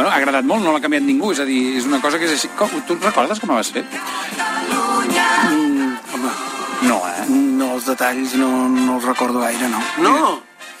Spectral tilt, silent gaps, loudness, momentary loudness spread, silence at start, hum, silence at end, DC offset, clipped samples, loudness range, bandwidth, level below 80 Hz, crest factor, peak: -3 dB/octave; none; -17 LUFS; 8 LU; 0 s; none; 0 s; under 0.1%; under 0.1%; 2 LU; 16 kHz; -64 dBFS; 16 dB; -2 dBFS